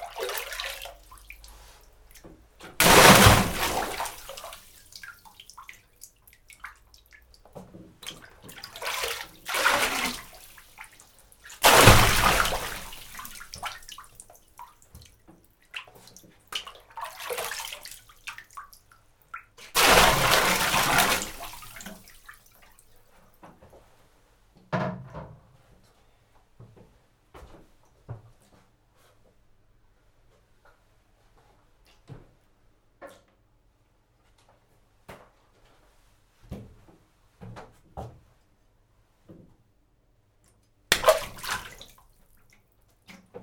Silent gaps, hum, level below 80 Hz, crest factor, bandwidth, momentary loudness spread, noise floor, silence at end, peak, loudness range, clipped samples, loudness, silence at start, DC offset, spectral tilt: none; none; -42 dBFS; 28 dB; over 20 kHz; 29 LU; -65 dBFS; 0.05 s; 0 dBFS; 22 LU; under 0.1%; -21 LUFS; 0 s; under 0.1%; -3 dB/octave